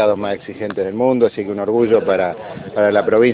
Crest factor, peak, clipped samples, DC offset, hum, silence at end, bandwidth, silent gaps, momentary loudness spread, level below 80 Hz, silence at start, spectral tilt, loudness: 14 dB; -2 dBFS; under 0.1%; under 0.1%; none; 0 s; 4.8 kHz; none; 11 LU; -56 dBFS; 0 s; -11.5 dB/octave; -17 LUFS